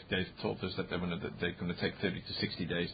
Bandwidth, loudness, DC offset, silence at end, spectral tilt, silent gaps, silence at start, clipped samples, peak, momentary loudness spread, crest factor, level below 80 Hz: 5 kHz; -37 LUFS; under 0.1%; 0 s; -9.5 dB/octave; none; 0 s; under 0.1%; -18 dBFS; 3 LU; 18 dB; -56 dBFS